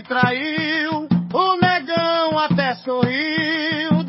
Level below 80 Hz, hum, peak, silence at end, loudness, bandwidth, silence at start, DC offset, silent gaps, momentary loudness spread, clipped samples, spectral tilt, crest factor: -54 dBFS; none; -2 dBFS; 0 s; -19 LUFS; 5.8 kHz; 0 s; under 0.1%; none; 4 LU; under 0.1%; -9.5 dB/octave; 16 dB